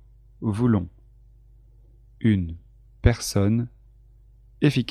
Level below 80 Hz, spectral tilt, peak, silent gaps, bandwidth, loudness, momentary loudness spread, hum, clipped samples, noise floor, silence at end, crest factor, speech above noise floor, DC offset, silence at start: -38 dBFS; -6.5 dB/octave; -4 dBFS; none; 14 kHz; -24 LUFS; 13 LU; 50 Hz at -45 dBFS; under 0.1%; -52 dBFS; 0 s; 22 dB; 30 dB; under 0.1%; 0.4 s